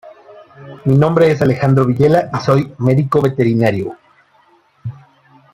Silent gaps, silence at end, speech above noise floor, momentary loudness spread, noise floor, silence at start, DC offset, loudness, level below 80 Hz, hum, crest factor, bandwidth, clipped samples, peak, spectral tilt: none; 0.6 s; 40 dB; 16 LU; -53 dBFS; 0.05 s; under 0.1%; -14 LUFS; -48 dBFS; none; 14 dB; 12 kHz; under 0.1%; -2 dBFS; -8.5 dB/octave